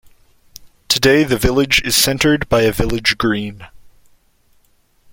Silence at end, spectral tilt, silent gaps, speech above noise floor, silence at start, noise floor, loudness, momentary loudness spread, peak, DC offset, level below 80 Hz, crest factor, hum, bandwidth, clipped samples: 1.25 s; -3.5 dB/octave; none; 41 dB; 0.6 s; -56 dBFS; -14 LUFS; 6 LU; 0 dBFS; under 0.1%; -34 dBFS; 18 dB; none; 17 kHz; under 0.1%